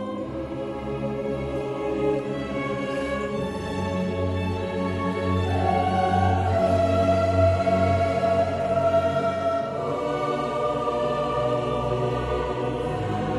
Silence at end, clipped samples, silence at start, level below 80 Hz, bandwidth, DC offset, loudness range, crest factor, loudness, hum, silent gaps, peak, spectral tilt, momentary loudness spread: 0 s; under 0.1%; 0 s; -44 dBFS; 11.5 kHz; under 0.1%; 6 LU; 16 dB; -25 LUFS; none; none; -8 dBFS; -7.5 dB/octave; 8 LU